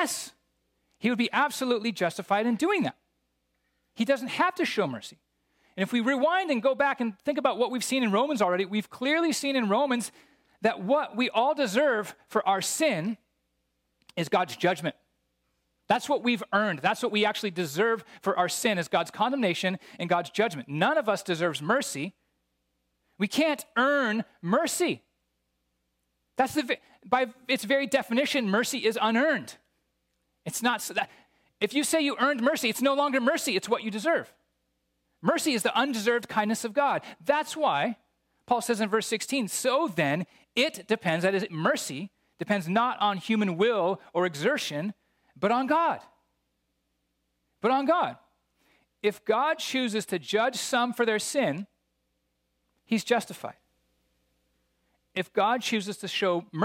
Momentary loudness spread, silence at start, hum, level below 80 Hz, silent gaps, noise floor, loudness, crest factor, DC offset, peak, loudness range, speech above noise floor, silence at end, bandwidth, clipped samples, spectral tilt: 7 LU; 0 s; 60 Hz at -65 dBFS; -76 dBFS; none; -77 dBFS; -27 LUFS; 18 dB; under 0.1%; -10 dBFS; 4 LU; 50 dB; 0 s; 16.5 kHz; under 0.1%; -4 dB/octave